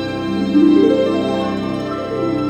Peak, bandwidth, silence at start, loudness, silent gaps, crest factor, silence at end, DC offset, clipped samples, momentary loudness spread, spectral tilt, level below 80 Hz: -2 dBFS; 9 kHz; 0 s; -16 LUFS; none; 14 dB; 0 s; under 0.1%; under 0.1%; 10 LU; -7.5 dB/octave; -46 dBFS